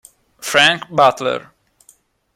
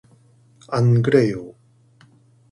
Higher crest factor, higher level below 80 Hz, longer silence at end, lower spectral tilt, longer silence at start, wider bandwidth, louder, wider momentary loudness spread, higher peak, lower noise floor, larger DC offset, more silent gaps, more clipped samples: about the same, 18 dB vs 18 dB; about the same, -60 dBFS vs -56 dBFS; about the same, 0.95 s vs 1 s; second, -2.5 dB/octave vs -8.5 dB/octave; second, 0.4 s vs 0.7 s; first, 16.5 kHz vs 11 kHz; first, -15 LUFS vs -18 LUFS; second, 13 LU vs 17 LU; about the same, 0 dBFS vs -2 dBFS; about the same, -54 dBFS vs -54 dBFS; neither; neither; neither